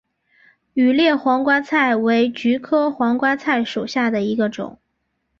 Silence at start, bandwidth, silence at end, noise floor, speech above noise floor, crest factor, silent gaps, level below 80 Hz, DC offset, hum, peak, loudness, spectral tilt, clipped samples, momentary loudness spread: 0.75 s; 7.2 kHz; 0.7 s; -72 dBFS; 54 dB; 14 dB; none; -62 dBFS; under 0.1%; none; -4 dBFS; -18 LUFS; -5.5 dB/octave; under 0.1%; 6 LU